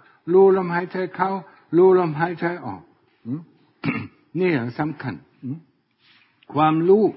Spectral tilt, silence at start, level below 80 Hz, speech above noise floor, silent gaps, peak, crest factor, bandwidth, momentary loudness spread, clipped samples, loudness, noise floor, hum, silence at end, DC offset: -12 dB/octave; 0.25 s; -64 dBFS; 40 dB; none; -6 dBFS; 16 dB; 5.6 kHz; 18 LU; under 0.1%; -21 LUFS; -60 dBFS; none; 0.05 s; under 0.1%